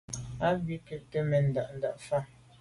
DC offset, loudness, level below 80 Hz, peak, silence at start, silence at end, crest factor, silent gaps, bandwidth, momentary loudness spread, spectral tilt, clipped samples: under 0.1%; -32 LUFS; -56 dBFS; -16 dBFS; 0.1 s; 0.35 s; 16 dB; none; 11.5 kHz; 12 LU; -6.5 dB/octave; under 0.1%